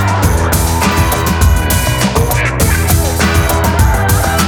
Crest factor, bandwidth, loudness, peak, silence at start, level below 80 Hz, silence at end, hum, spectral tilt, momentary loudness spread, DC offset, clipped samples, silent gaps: 10 dB; over 20 kHz; -12 LUFS; 0 dBFS; 0 s; -18 dBFS; 0 s; none; -4.5 dB/octave; 2 LU; under 0.1%; under 0.1%; none